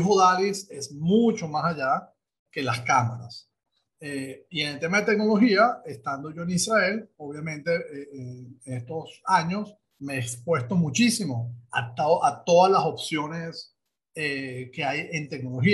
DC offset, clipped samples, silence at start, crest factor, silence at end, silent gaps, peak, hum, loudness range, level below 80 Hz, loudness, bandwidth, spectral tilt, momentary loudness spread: under 0.1%; under 0.1%; 0 s; 18 dB; 0 s; 2.39-2.46 s; -6 dBFS; none; 5 LU; -66 dBFS; -25 LUFS; 12.5 kHz; -5 dB/octave; 18 LU